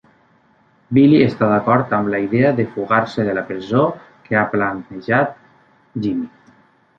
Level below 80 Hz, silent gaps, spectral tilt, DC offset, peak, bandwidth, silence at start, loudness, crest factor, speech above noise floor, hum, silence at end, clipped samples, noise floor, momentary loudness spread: -54 dBFS; none; -9 dB/octave; under 0.1%; -2 dBFS; 6.8 kHz; 0.9 s; -17 LUFS; 16 dB; 39 dB; none; 0.7 s; under 0.1%; -56 dBFS; 11 LU